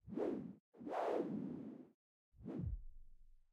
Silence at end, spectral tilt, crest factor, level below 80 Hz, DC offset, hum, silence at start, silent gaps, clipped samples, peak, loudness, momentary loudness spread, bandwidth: 0.1 s; -8.5 dB/octave; 18 dB; -58 dBFS; under 0.1%; none; 0.05 s; 0.60-0.72 s, 1.94-2.32 s; under 0.1%; -28 dBFS; -45 LUFS; 15 LU; 12 kHz